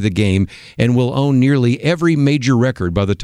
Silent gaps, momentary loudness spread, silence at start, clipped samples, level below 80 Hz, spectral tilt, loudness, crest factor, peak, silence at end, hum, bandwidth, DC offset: none; 5 LU; 0 s; under 0.1%; -40 dBFS; -7 dB/octave; -15 LUFS; 14 dB; -2 dBFS; 0 s; none; 11 kHz; under 0.1%